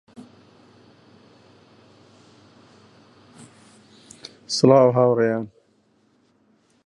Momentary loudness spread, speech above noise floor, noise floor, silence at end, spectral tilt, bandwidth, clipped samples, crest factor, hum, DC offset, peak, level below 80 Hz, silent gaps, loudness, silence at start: 27 LU; 46 dB; -62 dBFS; 1.4 s; -6 dB/octave; 11.5 kHz; under 0.1%; 24 dB; none; under 0.1%; 0 dBFS; -70 dBFS; none; -18 LUFS; 4.5 s